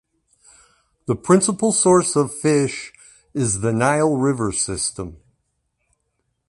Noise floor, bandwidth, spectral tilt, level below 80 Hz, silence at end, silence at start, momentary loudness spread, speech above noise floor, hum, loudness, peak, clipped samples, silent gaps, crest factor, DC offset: -72 dBFS; 11.5 kHz; -4.5 dB/octave; -50 dBFS; 1.35 s; 1.1 s; 17 LU; 54 dB; none; -19 LUFS; -2 dBFS; under 0.1%; none; 18 dB; under 0.1%